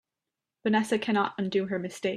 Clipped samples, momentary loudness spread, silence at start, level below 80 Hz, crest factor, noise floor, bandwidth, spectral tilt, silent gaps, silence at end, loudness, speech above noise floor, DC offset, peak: under 0.1%; 6 LU; 0.65 s; -72 dBFS; 16 dB; -88 dBFS; 13 kHz; -5.5 dB/octave; none; 0 s; -28 LUFS; 61 dB; under 0.1%; -12 dBFS